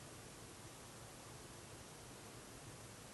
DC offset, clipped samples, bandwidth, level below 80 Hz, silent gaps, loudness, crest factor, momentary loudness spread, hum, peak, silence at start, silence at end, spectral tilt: under 0.1%; under 0.1%; 12.5 kHz; -70 dBFS; none; -55 LUFS; 14 dB; 0 LU; none; -42 dBFS; 0 s; 0 s; -3.5 dB/octave